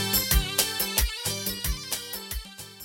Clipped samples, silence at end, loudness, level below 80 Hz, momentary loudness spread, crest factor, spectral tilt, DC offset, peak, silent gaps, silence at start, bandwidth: under 0.1%; 0 s; -26 LUFS; -34 dBFS; 13 LU; 24 dB; -2 dB/octave; under 0.1%; -4 dBFS; none; 0 s; 19 kHz